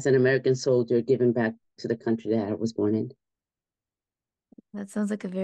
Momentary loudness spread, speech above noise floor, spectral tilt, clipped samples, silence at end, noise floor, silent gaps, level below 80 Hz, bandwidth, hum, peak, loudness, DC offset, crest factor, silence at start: 13 LU; over 65 dB; -7 dB/octave; under 0.1%; 0 s; under -90 dBFS; none; -74 dBFS; 9.8 kHz; none; -10 dBFS; -26 LUFS; under 0.1%; 16 dB; 0 s